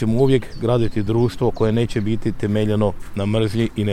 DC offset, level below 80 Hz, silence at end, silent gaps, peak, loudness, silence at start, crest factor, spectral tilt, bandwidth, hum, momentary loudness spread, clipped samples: under 0.1%; -34 dBFS; 0 s; none; -4 dBFS; -20 LUFS; 0 s; 14 dB; -8 dB/octave; 13 kHz; none; 5 LU; under 0.1%